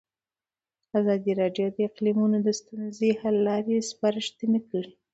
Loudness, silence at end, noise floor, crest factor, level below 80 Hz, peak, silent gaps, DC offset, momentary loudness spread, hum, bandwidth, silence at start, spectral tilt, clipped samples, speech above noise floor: -26 LUFS; 0.25 s; under -90 dBFS; 16 dB; -72 dBFS; -10 dBFS; none; under 0.1%; 6 LU; none; 8.2 kHz; 0.95 s; -6 dB/octave; under 0.1%; over 65 dB